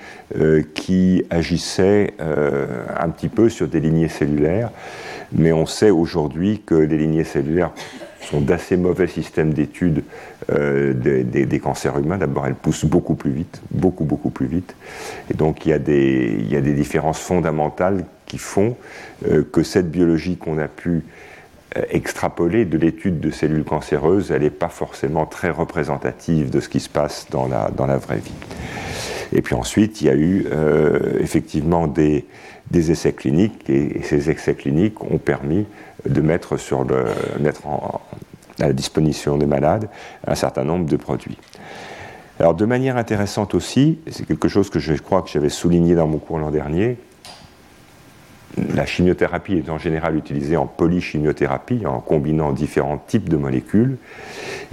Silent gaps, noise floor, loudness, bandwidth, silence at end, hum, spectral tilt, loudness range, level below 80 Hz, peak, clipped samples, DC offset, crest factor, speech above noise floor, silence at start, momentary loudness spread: none; -47 dBFS; -19 LUFS; 14 kHz; 0.05 s; none; -7 dB/octave; 3 LU; -40 dBFS; -2 dBFS; under 0.1%; under 0.1%; 18 dB; 28 dB; 0 s; 11 LU